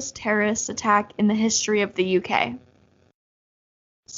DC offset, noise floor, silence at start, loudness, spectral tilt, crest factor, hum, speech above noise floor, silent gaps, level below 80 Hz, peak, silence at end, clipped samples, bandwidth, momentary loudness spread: under 0.1%; under -90 dBFS; 0 s; -22 LUFS; -3.5 dB/octave; 20 dB; none; over 68 dB; 3.14-4.03 s; -62 dBFS; -4 dBFS; 0 s; under 0.1%; 7.6 kHz; 4 LU